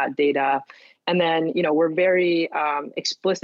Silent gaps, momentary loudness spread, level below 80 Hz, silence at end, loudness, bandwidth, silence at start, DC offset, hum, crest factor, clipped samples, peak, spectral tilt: none; 6 LU; -78 dBFS; 0.05 s; -22 LUFS; 7.6 kHz; 0 s; under 0.1%; none; 12 dB; under 0.1%; -8 dBFS; -5 dB/octave